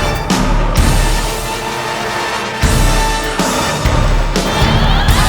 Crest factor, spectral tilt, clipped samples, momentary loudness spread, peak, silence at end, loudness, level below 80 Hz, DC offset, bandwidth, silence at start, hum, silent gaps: 12 dB; -4 dB/octave; under 0.1%; 6 LU; 0 dBFS; 0 s; -15 LUFS; -16 dBFS; under 0.1%; over 20 kHz; 0 s; none; none